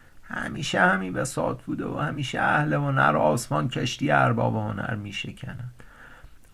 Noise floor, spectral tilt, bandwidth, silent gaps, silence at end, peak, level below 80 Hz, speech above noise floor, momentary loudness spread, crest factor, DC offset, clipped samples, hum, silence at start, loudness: -47 dBFS; -5.5 dB/octave; 15 kHz; none; 0.1 s; -6 dBFS; -52 dBFS; 22 dB; 13 LU; 20 dB; under 0.1%; under 0.1%; none; 0.15 s; -25 LUFS